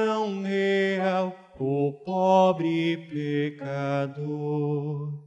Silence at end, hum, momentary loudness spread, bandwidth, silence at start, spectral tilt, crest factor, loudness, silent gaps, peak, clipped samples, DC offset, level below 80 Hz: 0 s; none; 10 LU; 8.6 kHz; 0 s; -7.5 dB/octave; 16 dB; -26 LUFS; none; -10 dBFS; under 0.1%; under 0.1%; -72 dBFS